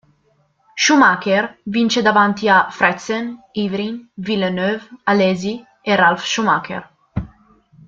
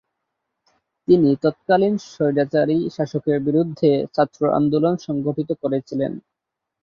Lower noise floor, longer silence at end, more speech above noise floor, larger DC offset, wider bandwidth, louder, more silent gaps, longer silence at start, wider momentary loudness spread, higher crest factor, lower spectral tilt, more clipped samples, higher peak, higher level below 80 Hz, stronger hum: second, -60 dBFS vs -83 dBFS; about the same, 0.6 s vs 0.65 s; second, 44 dB vs 64 dB; neither; about the same, 7.6 kHz vs 7.2 kHz; first, -17 LUFS vs -20 LUFS; neither; second, 0.75 s vs 1.1 s; first, 16 LU vs 7 LU; about the same, 18 dB vs 18 dB; second, -4 dB/octave vs -8 dB/octave; neither; first, 0 dBFS vs -4 dBFS; first, -50 dBFS vs -60 dBFS; neither